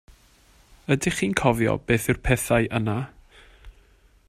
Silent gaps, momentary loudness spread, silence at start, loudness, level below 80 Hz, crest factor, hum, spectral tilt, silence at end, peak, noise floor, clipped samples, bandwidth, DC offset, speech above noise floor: none; 8 LU; 0.1 s; -23 LUFS; -42 dBFS; 24 dB; none; -5.5 dB/octave; 0.55 s; -2 dBFS; -57 dBFS; under 0.1%; 15.5 kHz; under 0.1%; 34 dB